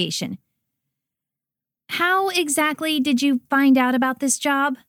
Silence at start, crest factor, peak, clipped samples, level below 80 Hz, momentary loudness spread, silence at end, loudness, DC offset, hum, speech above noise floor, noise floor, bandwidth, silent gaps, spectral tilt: 0 s; 14 dB; -8 dBFS; under 0.1%; -72 dBFS; 10 LU; 0.15 s; -20 LUFS; under 0.1%; none; 68 dB; -88 dBFS; 17 kHz; none; -2.5 dB/octave